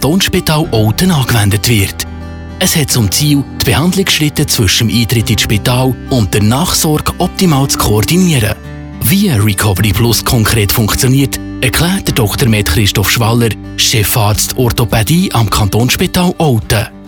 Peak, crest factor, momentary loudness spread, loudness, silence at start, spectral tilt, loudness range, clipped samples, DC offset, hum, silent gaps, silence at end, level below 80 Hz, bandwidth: 0 dBFS; 10 dB; 4 LU; -11 LUFS; 0 s; -4.5 dB/octave; 1 LU; under 0.1%; under 0.1%; none; none; 0 s; -26 dBFS; over 20 kHz